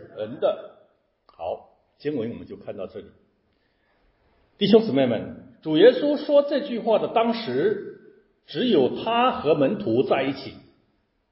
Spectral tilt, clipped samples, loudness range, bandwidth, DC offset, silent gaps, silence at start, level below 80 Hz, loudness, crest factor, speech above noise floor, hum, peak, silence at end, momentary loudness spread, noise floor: -9.5 dB/octave; under 0.1%; 15 LU; 5.8 kHz; under 0.1%; none; 0 s; -62 dBFS; -22 LUFS; 22 dB; 46 dB; none; -2 dBFS; 0.75 s; 18 LU; -68 dBFS